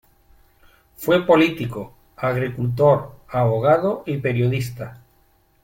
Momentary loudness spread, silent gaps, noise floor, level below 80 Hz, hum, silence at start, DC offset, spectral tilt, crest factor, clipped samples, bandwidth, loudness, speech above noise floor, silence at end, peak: 14 LU; none; -59 dBFS; -52 dBFS; none; 1 s; under 0.1%; -7.5 dB/octave; 18 dB; under 0.1%; 16.5 kHz; -20 LUFS; 40 dB; 0.65 s; -2 dBFS